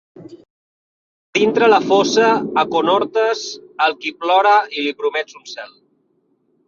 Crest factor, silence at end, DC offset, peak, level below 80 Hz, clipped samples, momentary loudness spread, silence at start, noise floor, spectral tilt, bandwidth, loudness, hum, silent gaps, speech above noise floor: 16 dB; 1 s; under 0.1%; -2 dBFS; -64 dBFS; under 0.1%; 17 LU; 0.2 s; -63 dBFS; -3.5 dB/octave; 7.4 kHz; -16 LUFS; none; 0.50-1.33 s; 47 dB